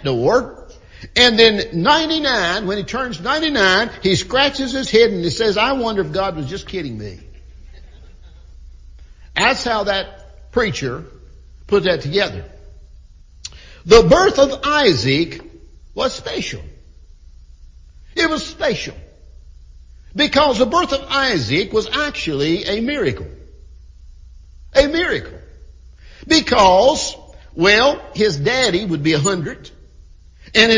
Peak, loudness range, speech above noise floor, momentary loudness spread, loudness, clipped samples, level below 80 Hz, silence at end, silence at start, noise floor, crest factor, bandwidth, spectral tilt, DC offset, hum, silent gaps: 0 dBFS; 9 LU; 27 dB; 17 LU; -16 LUFS; under 0.1%; -38 dBFS; 0 s; 0 s; -43 dBFS; 18 dB; 7.6 kHz; -4 dB/octave; under 0.1%; none; none